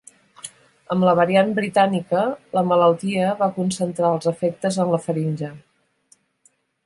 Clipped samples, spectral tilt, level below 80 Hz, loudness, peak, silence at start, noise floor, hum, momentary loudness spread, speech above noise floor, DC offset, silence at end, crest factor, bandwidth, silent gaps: under 0.1%; -6 dB/octave; -64 dBFS; -20 LUFS; -4 dBFS; 0.45 s; -62 dBFS; none; 12 LU; 42 dB; under 0.1%; 1.25 s; 18 dB; 11.5 kHz; none